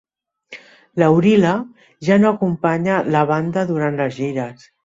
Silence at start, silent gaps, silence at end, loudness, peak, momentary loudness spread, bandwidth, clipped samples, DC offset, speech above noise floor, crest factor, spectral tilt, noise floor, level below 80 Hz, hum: 0.5 s; none; 0.35 s; -17 LUFS; -2 dBFS; 12 LU; 7.8 kHz; under 0.1%; under 0.1%; 27 dB; 16 dB; -7.5 dB/octave; -44 dBFS; -58 dBFS; none